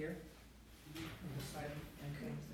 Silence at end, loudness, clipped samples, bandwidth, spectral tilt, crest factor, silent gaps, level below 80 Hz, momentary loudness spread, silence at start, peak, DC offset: 0 s; -49 LUFS; under 0.1%; over 20 kHz; -5.5 dB/octave; 16 dB; none; -62 dBFS; 13 LU; 0 s; -32 dBFS; under 0.1%